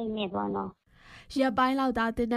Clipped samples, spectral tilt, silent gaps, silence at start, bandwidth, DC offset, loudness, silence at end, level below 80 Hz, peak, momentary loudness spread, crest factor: under 0.1%; -6 dB/octave; none; 0 s; 13.5 kHz; under 0.1%; -29 LUFS; 0 s; -52 dBFS; -12 dBFS; 10 LU; 18 dB